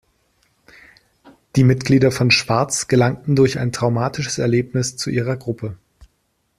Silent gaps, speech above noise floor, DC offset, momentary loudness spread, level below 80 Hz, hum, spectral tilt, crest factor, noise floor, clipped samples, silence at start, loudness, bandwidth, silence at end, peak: none; 50 dB; under 0.1%; 9 LU; -50 dBFS; none; -5 dB/octave; 18 dB; -67 dBFS; under 0.1%; 1.55 s; -18 LUFS; 14 kHz; 0.85 s; -2 dBFS